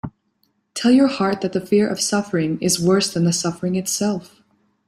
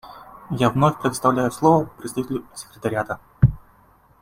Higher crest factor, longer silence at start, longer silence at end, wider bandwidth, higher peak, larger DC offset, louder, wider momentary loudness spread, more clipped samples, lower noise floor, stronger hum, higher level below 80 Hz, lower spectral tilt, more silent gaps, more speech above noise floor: about the same, 16 dB vs 20 dB; about the same, 0.05 s vs 0.05 s; about the same, 0.65 s vs 0.65 s; about the same, 15.5 kHz vs 16 kHz; about the same, -4 dBFS vs -2 dBFS; neither; about the same, -19 LUFS vs -21 LUFS; second, 8 LU vs 17 LU; neither; first, -67 dBFS vs -55 dBFS; neither; second, -58 dBFS vs -42 dBFS; second, -4.5 dB/octave vs -6.5 dB/octave; neither; first, 48 dB vs 34 dB